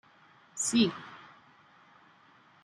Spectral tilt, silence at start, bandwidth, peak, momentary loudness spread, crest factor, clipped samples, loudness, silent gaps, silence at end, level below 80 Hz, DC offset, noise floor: -3 dB/octave; 0.55 s; 13 kHz; -14 dBFS; 23 LU; 20 dB; under 0.1%; -29 LUFS; none; 1.4 s; -74 dBFS; under 0.1%; -61 dBFS